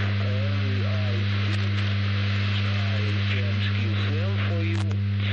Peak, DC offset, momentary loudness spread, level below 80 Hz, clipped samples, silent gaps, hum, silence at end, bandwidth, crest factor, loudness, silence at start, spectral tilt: -14 dBFS; under 0.1%; 1 LU; -40 dBFS; under 0.1%; none; 50 Hz at -25 dBFS; 0 s; 6.8 kHz; 10 dB; -25 LUFS; 0 s; -7 dB/octave